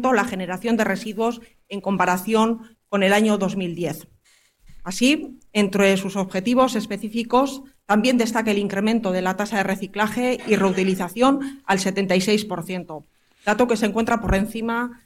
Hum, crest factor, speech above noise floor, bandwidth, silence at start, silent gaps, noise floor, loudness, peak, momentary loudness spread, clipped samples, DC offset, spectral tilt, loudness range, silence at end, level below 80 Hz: none; 16 dB; 38 dB; 16.5 kHz; 0 s; none; -59 dBFS; -21 LUFS; -4 dBFS; 10 LU; under 0.1%; under 0.1%; -5 dB/octave; 2 LU; 0.1 s; -44 dBFS